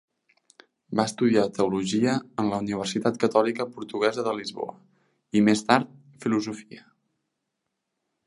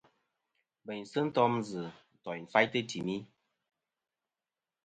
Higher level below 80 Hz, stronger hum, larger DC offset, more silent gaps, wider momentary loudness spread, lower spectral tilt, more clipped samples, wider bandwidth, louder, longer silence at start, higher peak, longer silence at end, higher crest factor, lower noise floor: first, -66 dBFS vs -76 dBFS; neither; neither; neither; second, 12 LU vs 16 LU; about the same, -5.5 dB/octave vs -5.5 dB/octave; neither; first, 11.5 kHz vs 9 kHz; first, -25 LUFS vs -33 LUFS; about the same, 0.9 s vs 0.85 s; first, -2 dBFS vs -10 dBFS; about the same, 1.5 s vs 1.6 s; about the same, 24 dB vs 26 dB; second, -81 dBFS vs under -90 dBFS